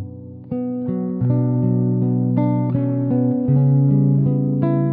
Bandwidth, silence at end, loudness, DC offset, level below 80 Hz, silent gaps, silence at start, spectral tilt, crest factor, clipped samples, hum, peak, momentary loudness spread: 2.5 kHz; 0 s; -18 LUFS; under 0.1%; -54 dBFS; none; 0 s; -14.5 dB/octave; 14 dB; under 0.1%; none; -4 dBFS; 9 LU